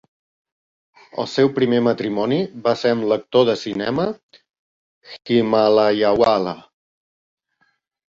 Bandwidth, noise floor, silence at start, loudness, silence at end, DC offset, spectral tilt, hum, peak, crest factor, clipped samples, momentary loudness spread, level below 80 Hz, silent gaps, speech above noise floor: 7.6 kHz; -66 dBFS; 1.15 s; -19 LUFS; 1.5 s; under 0.1%; -6.5 dB/octave; none; -2 dBFS; 18 dB; under 0.1%; 12 LU; -58 dBFS; 4.23-4.29 s, 4.59-5.02 s; 48 dB